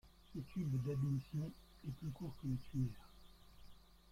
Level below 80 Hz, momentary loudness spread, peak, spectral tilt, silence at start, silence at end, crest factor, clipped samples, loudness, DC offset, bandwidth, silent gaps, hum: -62 dBFS; 13 LU; -28 dBFS; -8.5 dB/octave; 0.05 s; 0 s; 16 dB; under 0.1%; -44 LUFS; under 0.1%; 15.5 kHz; none; none